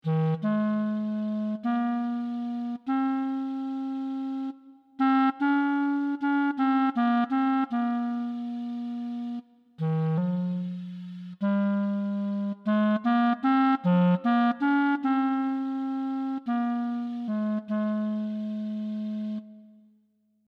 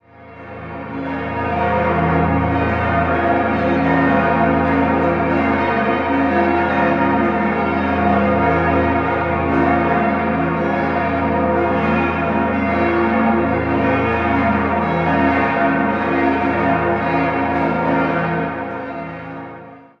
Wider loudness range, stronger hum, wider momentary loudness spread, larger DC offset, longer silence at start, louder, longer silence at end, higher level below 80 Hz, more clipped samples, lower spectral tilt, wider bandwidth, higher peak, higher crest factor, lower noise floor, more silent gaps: first, 6 LU vs 2 LU; neither; about the same, 10 LU vs 8 LU; neither; second, 0.05 s vs 0.2 s; second, -27 LUFS vs -17 LUFS; first, 0.85 s vs 0.2 s; second, -84 dBFS vs -36 dBFS; neither; about the same, -9.5 dB/octave vs -9 dB/octave; second, 5.4 kHz vs 6.4 kHz; second, -12 dBFS vs -2 dBFS; about the same, 14 dB vs 16 dB; first, -68 dBFS vs -38 dBFS; neither